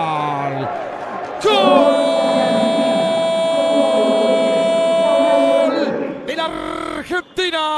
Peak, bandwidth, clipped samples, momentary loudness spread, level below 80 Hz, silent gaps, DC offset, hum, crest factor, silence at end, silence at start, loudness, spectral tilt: 0 dBFS; 12 kHz; under 0.1%; 11 LU; -54 dBFS; none; under 0.1%; none; 16 dB; 0 s; 0 s; -16 LUFS; -4.5 dB/octave